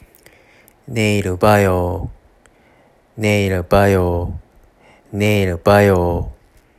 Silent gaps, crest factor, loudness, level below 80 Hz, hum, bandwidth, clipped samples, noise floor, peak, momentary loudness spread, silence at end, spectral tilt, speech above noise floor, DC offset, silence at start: none; 18 dB; -16 LUFS; -38 dBFS; none; 15 kHz; under 0.1%; -52 dBFS; 0 dBFS; 16 LU; 0.45 s; -6.5 dB/octave; 37 dB; under 0.1%; 0.9 s